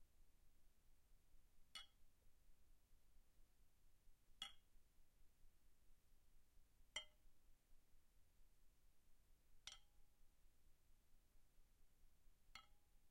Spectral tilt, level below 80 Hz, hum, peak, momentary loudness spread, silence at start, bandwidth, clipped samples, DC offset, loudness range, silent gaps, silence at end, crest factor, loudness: -0.5 dB/octave; -74 dBFS; none; -36 dBFS; 12 LU; 0 s; 16 kHz; under 0.1%; under 0.1%; 7 LU; none; 0 s; 30 dB; -60 LUFS